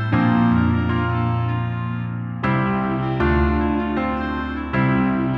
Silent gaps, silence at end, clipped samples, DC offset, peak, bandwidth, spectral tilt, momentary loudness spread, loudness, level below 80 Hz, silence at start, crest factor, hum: none; 0 s; under 0.1%; under 0.1%; -6 dBFS; 5.6 kHz; -10 dB/octave; 8 LU; -21 LUFS; -32 dBFS; 0 s; 14 dB; none